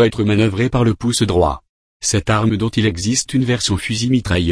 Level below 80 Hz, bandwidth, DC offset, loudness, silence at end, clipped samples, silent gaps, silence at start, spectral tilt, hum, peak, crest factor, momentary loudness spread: -34 dBFS; 11 kHz; under 0.1%; -17 LUFS; 0 s; under 0.1%; 1.69-2.00 s; 0 s; -5 dB/octave; none; -2 dBFS; 14 dB; 3 LU